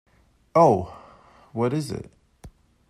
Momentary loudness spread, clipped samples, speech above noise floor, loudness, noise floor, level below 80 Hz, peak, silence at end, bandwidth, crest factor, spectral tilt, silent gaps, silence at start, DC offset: 18 LU; under 0.1%; 31 dB; -22 LUFS; -52 dBFS; -56 dBFS; -4 dBFS; 0.4 s; 14.5 kHz; 20 dB; -7.5 dB/octave; none; 0.55 s; under 0.1%